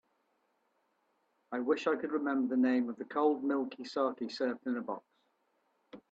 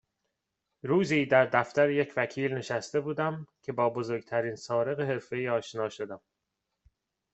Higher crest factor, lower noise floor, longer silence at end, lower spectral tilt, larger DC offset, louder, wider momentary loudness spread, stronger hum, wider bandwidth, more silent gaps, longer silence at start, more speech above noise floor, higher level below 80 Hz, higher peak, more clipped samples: about the same, 18 dB vs 22 dB; second, -77 dBFS vs -84 dBFS; second, 0.15 s vs 1.15 s; about the same, -5.5 dB/octave vs -6 dB/octave; neither; second, -34 LUFS vs -29 LUFS; second, 8 LU vs 12 LU; neither; about the same, 7.8 kHz vs 8.2 kHz; neither; first, 1.5 s vs 0.85 s; second, 44 dB vs 55 dB; second, -86 dBFS vs -72 dBFS; second, -18 dBFS vs -8 dBFS; neither